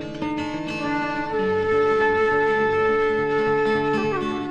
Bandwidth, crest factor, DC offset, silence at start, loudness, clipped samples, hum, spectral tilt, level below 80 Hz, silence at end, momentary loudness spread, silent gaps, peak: 8.4 kHz; 12 dB; under 0.1%; 0 s; -22 LUFS; under 0.1%; none; -6 dB/octave; -50 dBFS; 0 s; 8 LU; none; -10 dBFS